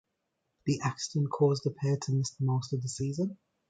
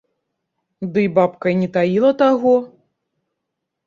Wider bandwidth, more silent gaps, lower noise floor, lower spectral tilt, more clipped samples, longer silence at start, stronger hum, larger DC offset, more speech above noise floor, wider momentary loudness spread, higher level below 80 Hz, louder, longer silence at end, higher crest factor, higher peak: first, 9.2 kHz vs 7.2 kHz; neither; about the same, -81 dBFS vs -78 dBFS; second, -6 dB/octave vs -8.5 dB/octave; neither; second, 0.65 s vs 0.8 s; neither; neither; second, 51 dB vs 63 dB; about the same, 7 LU vs 6 LU; about the same, -66 dBFS vs -62 dBFS; second, -31 LUFS vs -17 LUFS; second, 0.35 s vs 1.2 s; about the same, 18 dB vs 16 dB; second, -14 dBFS vs -2 dBFS